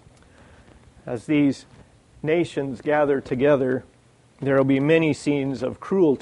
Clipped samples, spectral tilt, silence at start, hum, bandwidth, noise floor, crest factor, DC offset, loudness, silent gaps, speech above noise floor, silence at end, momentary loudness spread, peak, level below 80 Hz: under 0.1%; -7 dB/octave; 1.05 s; none; 10.5 kHz; -55 dBFS; 18 dB; under 0.1%; -22 LUFS; none; 34 dB; 0 s; 12 LU; -6 dBFS; -56 dBFS